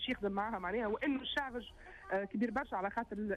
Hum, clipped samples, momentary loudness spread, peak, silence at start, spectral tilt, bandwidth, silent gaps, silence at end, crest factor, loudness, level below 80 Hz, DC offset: none; under 0.1%; 8 LU; -24 dBFS; 0 s; -6 dB/octave; 12.5 kHz; none; 0 s; 14 dB; -38 LUFS; -60 dBFS; under 0.1%